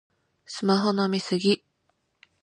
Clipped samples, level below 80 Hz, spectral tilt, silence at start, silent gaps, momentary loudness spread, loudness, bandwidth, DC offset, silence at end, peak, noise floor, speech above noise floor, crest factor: under 0.1%; -74 dBFS; -5.5 dB/octave; 0.5 s; none; 7 LU; -25 LUFS; 10.5 kHz; under 0.1%; 0.85 s; -10 dBFS; -73 dBFS; 49 dB; 18 dB